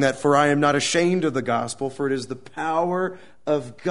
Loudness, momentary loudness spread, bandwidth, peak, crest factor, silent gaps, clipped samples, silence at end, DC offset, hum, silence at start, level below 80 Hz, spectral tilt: -22 LUFS; 11 LU; 11 kHz; -4 dBFS; 18 dB; none; under 0.1%; 0 s; 0.5%; none; 0 s; -62 dBFS; -4.5 dB/octave